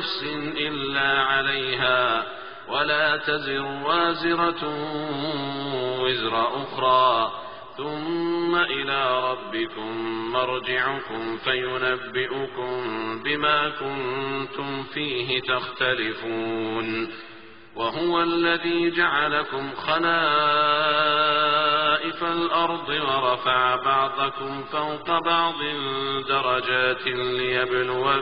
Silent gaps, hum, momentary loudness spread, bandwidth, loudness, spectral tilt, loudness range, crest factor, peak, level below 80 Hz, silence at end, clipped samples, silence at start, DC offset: none; none; 9 LU; 5.4 kHz; -23 LUFS; -1 dB/octave; 5 LU; 18 dB; -6 dBFS; -60 dBFS; 0 s; under 0.1%; 0 s; 0.4%